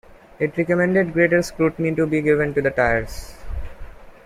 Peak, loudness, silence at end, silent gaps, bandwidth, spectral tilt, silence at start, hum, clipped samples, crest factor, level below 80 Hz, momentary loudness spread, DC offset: -4 dBFS; -20 LUFS; 0.15 s; none; 15.5 kHz; -7 dB/octave; 0.1 s; none; under 0.1%; 18 dB; -38 dBFS; 17 LU; under 0.1%